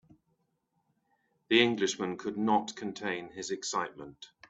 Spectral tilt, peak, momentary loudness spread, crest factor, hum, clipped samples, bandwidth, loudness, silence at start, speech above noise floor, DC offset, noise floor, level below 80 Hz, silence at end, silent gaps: -3.5 dB/octave; -8 dBFS; 14 LU; 24 dB; none; under 0.1%; 8.4 kHz; -31 LUFS; 1.5 s; 46 dB; under 0.1%; -78 dBFS; -74 dBFS; 0.25 s; none